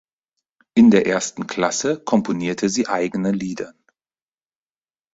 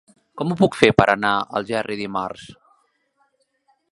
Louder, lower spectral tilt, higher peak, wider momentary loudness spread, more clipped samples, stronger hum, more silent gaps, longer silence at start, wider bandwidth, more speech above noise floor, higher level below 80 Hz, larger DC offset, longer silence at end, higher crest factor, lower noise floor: about the same, -19 LUFS vs -20 LUFS; about the same, -5 dB/octave vs -6 dB/octave; about the same, -2 dBFS vs 0 dBFS; about the same, 12 LU vs 13 LU; neither; neither; neither; first, 0.75 s vs 0.35 s; second, 8 kHz vs 11.5 kHz; first, over 71 dB vs 47 dB; second, -58 dBFS vs -50 dBFS; neither; about the same, 1.45 s vs 1.4 s; about the same, 18 dB vs 22 dB; first, under -90 dBFS vs -66 dBFS